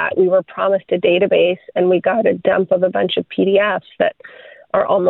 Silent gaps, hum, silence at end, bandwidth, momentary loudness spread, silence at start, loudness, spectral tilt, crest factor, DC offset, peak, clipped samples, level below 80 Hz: none; none; 0 s; 4.1 kHz; 5 LU; 0 s; -16 LUFS; -9 dB/octave; 14 dB; under 0.1%; -2 dBFS; under 0.1%; -60 dBFS